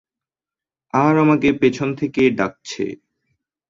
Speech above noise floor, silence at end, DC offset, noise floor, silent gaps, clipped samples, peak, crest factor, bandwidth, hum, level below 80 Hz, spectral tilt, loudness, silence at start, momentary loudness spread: over 73 dB; 0.75 s; under 0.1%; under -90 dBFS; none; under 0.1%; -4 dBFS; 16 dB; 7.6 kHz; none; -54 dBFS; -6.5 dB/octave; -18 LUFS; 0.95 s; 12 LU